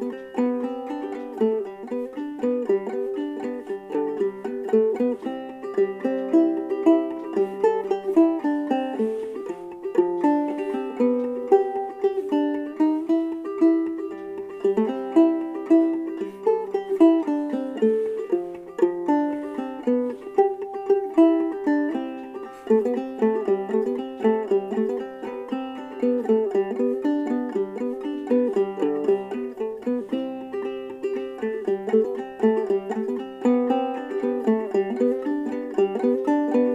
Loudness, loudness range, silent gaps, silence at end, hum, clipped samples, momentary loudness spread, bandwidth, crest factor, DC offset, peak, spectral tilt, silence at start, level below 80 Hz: -24 LUFS; 4 LU; none; 0 s; none; under 0.1%; 11 LU; 7.8 kHz; 18 dB; under 0.1%; -6 dBFS; -7.5 dB/octave; 0 s; -70 dBFS